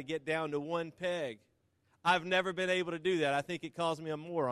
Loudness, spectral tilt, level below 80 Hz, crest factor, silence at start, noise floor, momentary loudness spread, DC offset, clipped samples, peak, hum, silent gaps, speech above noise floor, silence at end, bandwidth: -34 LUFS; -5 dB/octave; -76 dBFS; 20 dB; 0 s; -74 dBFS; 8 LU; under 0.1%; under 0.1%; -16 dBFS; none; none; 40 dB; 0 s; 13 kHz